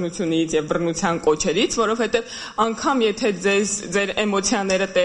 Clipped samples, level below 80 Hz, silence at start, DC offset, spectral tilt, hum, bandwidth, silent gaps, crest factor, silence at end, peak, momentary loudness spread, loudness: under 0.1%; -48 dBFS; 0 s; under 0.1%; -3.5 dB/octave; none; 11 kHz; none; 14 dB; 0 s; -6 dBFS; 3 LU; -21 LUFS